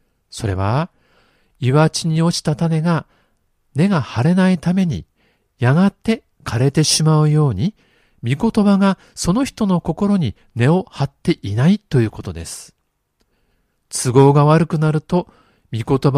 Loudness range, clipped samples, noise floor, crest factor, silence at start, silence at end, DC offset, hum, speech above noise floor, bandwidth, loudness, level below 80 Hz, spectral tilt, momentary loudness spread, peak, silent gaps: 3 LU; under 0.1%; -67 dBFS; 18 dB; 0.35 s; 0 s; under 0.1%; none; 51 dB; 14 kHz; -17 LUFS; -46 dBFS; -6 dB/octave; 13 LU; 0 dBFS; none